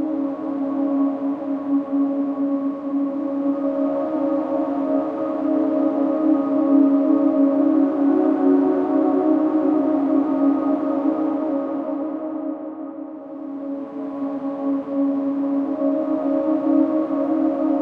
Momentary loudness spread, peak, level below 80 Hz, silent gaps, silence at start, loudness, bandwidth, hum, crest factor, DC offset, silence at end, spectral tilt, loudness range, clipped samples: 10 LU; -6 dBFS; -68 dBFS; none; 0 s; -21 LUFS; 3.6 kHz; none; 14 dB; under 0.1%; 0 s; -9.5 dB/octave; 8 LU; under 0.1%